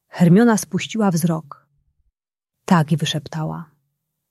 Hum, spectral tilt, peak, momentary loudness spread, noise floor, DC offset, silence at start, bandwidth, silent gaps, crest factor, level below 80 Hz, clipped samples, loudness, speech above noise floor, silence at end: none; -6 dB/octave; -2 dBFS; 14 LU; -85 dBFS; under 0.1%; 0.15 s; 14 kHz; none; 18 dB; -60 dBFS; under 0.1%; -19 LUFS; 67 dB; 0.65 s